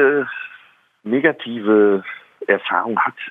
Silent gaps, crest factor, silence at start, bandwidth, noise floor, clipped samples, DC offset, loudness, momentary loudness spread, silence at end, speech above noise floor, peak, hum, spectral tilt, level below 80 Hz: none; 18 dB; 0 s; 3.9 kHz; -51 dBFS; under 0.1%; under 0.1%; -18 LUFS; 17 LU; 0 s; 33 dB; 0 dBFS; none; -8 dB/octave; -78 dBFS